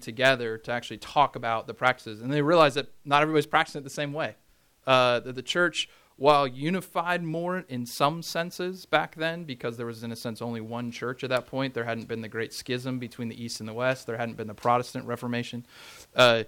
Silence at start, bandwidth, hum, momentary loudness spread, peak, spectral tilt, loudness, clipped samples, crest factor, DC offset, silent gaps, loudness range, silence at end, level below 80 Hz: 0 s; 18 kHz; none; 13 LU; -6 dBFS; -4.5 dB/octave; -27 LUFS; under 0.1%; 22 dB; under 0.1%; none; 7 LU; 0 s; -66 dBFS